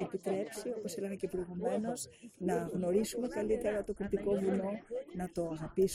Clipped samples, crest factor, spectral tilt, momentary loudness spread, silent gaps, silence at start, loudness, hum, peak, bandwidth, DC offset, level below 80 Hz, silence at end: under 0.1%; 16 dB; -6 dB/octave; 8 LU; none; 0 s; -36 LUFS; none; -20 dBFS; 15.5 kHz; under 0.1%; -58 dBFS; 0 s